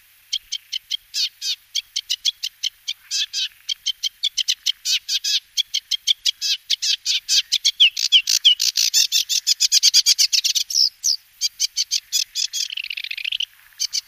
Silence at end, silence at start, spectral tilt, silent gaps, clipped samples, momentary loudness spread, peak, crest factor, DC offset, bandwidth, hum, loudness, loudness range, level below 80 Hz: 0.05 s; 0.3 s; 8 dB/octave; none; under 0.1%; 12 LU; -2 dBFS; 18 dB; under 0.1%; 15.5 kHz; none; -18 LUFS; 9 LU; -70 dBFS